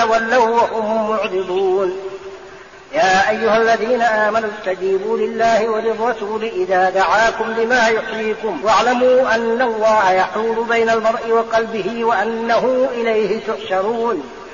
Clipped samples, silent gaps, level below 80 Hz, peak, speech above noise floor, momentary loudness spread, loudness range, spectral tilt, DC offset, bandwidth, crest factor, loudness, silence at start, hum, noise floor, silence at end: under 0.1%; none; -52 dBFS; -4 dBFS; 22 dB; 8 LU; 2 LU; -2 dB/octave; 0.2%; 7.2 kHz; 12 dB; -16 LUFS; 0 s; none; -38 dBFS; 0 s